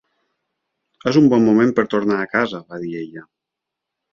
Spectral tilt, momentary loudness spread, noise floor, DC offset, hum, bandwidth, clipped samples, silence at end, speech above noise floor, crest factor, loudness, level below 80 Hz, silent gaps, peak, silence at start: -7 dB/octave; 16 LU; -83 dBFS; under 0.1%; none; 7.2 kHz; under 0.1%; 0.9 s; 66 dB; 18 dB; -17 LUFS; -60 dBFS; none; -2 dBFS; 1.05 s